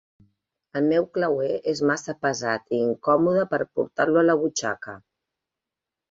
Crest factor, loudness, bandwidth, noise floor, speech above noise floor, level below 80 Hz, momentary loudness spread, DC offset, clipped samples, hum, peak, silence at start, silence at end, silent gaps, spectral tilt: 18 dB; -23 LUFS; 7.8 kHz; -87 dBFS; 64 dB; -66 dBFS; 8 LU; under 0.1%; under 0.1%; none; -6 dBFS; 0.75 s; 1.15 s; none; -5 dB/octave